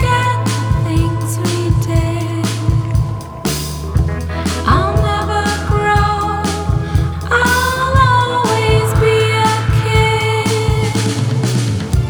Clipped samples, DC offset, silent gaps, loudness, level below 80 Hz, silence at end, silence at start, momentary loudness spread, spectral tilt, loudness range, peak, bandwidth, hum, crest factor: under 0.1%; under 0.1%; none; -15 LUFS; -24 dBFS; 0 s; 0 s; 6 LU; -5.5 dB/octave; 4 LU; 0 dBFS; over 20 kHz; none; 14 dB